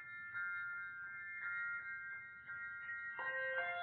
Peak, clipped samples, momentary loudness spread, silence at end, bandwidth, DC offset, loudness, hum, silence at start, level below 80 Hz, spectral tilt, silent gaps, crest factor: -30 dBFS; under 0.1%; 8 LU; 0 s; 4.3 kHz; under 0.1%; -44 LUFS; none; 0 s; -84 dBFS; 0.5 dB/octave; none; 16 dB